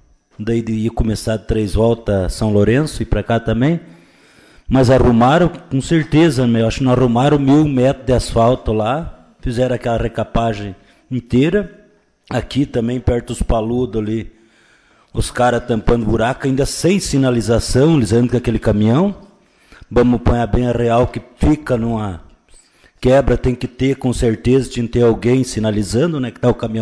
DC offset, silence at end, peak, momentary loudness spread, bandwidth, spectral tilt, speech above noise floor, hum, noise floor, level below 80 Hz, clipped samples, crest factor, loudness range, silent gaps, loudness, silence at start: under 0.1%; 0 s; -2 dBFS; 9 LU; 11 kHz; -6.5 dB/octave; 37 dB; none; -52 dBFS; -28 dBFS; under 0.1%; 12 dB; 6 LU; none; -16 LUFS; 0.4 s